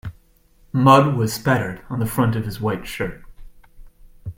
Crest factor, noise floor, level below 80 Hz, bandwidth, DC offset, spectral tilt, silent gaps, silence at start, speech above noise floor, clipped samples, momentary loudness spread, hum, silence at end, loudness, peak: 20 dB; -55 dBFS; -44 dBFS; 16.5 kHz; under 0.1%; -6.5 dB/octave; none; 0.05 s; 36 dB; under 0.1%; 15 LU; none; 0.05 s; -20 LUFS; 0 dBFS